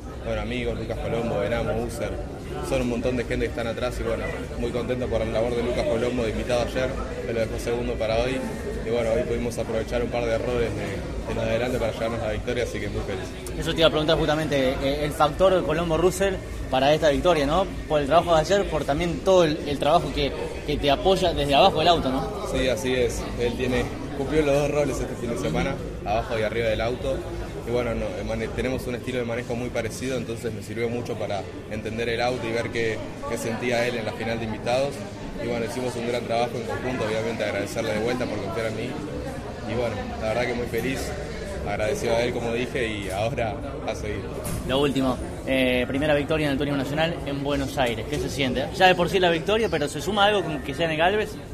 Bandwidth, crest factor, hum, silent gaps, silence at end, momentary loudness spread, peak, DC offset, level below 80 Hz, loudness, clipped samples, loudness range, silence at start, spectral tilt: 14.5 kHz; 22 dB; none; none; 0 s; 10 LU; -4 dBFS; under 0.1%; -38 dBFS; -25 LUFS; under 0.1%; 6 LU; 0 s; -5 dB/octave